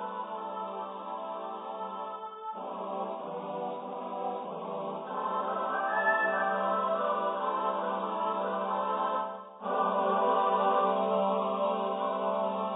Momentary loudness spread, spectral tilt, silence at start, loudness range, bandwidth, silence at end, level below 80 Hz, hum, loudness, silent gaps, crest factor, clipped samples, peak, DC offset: 12 LU; 0.5 dB/octave; 0 s; 9 LU; 3.9 kHz; 0 s; -86 dBFS; none; -31 LUFS; none; 16 dB; under 0.1%; -16 dBFS; under 0.1%